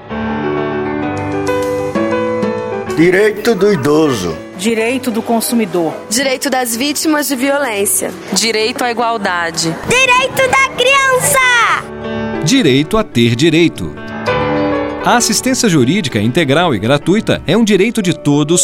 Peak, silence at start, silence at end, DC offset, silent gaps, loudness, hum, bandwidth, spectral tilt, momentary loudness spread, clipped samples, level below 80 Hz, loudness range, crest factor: 0 dBFS; 0 s; 0 s; under 0.1%; none; -13 LUFS; none; 16.5 kHz; -4 dB/octave; 8 LU; under 0.1%; -40 dBFS; 4 LU; 12 dB